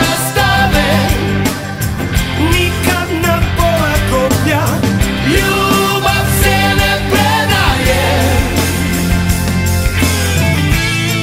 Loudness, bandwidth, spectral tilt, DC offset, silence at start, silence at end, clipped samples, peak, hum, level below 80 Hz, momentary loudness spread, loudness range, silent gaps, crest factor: -12 LUFS; 16.5 kHz; -4.5 dB/octave; under 0.1%; 0 s; 0 s; under 0.1%; 0 dBFS; none; -22 dBFS; 3 LU; 2 LU; none; 12 dB